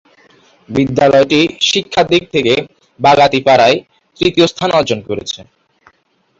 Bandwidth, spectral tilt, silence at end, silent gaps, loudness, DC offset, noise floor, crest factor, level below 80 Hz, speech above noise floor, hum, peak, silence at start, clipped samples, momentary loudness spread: 8 kHz; -4.5 dB/octave; 0.95 s; none; -12 LUFS; under 0.1%; -58 dBFS; 14 dB; -46 dBFS; 46 dB; none; 0 dBFS; 0.7 s; under 0.1%; 10 LU